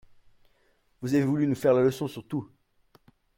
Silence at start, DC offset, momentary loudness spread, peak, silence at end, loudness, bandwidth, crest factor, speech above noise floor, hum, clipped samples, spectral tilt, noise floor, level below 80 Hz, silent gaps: 1 s; under 0.1%; 13 LU; -12 dBFS; 0.95 s; -26 LUFS; 16.5 kHz; 18 dB; 42 dB; none; under 0.1%; -7.5 dB/octave; -67 dBFS; -64 dBFS; none